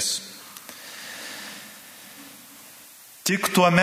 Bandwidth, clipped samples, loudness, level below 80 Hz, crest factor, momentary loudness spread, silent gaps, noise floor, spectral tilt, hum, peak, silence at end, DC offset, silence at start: 16 kHz; under 0.1%; -26 LUFS; -70 dBFS; 24 dB; 23 LU; none; -47 dBFS; -3.5 dB/octave; none; -2 dBFS; 0 s; under 0.1%; 0 s